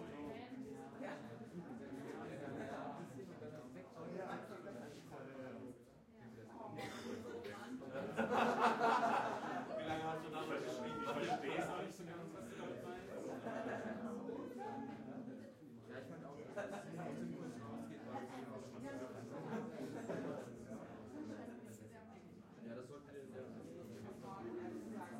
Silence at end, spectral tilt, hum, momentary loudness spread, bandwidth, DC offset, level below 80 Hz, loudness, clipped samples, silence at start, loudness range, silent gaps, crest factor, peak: 0 s; -5.5 dB/octave; none; 13 LU; 16 kHz; under 0.1%; -80 dBFS; -46 LUFS; under 0.1%; 0 s; 13 LU; none; 24 dB; -22 dBFS